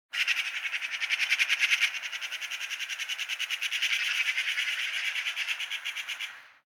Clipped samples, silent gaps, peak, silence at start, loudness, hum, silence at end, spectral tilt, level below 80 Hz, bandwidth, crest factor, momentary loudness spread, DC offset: under 0.1%; none; -10 dBFS; 0.15 s; -28 LUFS; none; 0.2 s; 5 dB/octave; under -90 dBFS; 17.5 kHz; 20 dB; 9 LU; under 0.1%